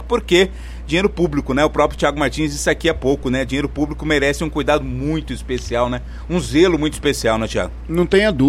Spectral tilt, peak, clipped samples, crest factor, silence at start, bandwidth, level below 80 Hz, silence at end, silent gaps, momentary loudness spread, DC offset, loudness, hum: -5 dB/octave; -2 dBFS; under 0.1%; 16 dB; 0 s; 15.5 kHz; -30 dBFS; 0 s; none; 8 LU; under 0.1%; -18 LUFS; none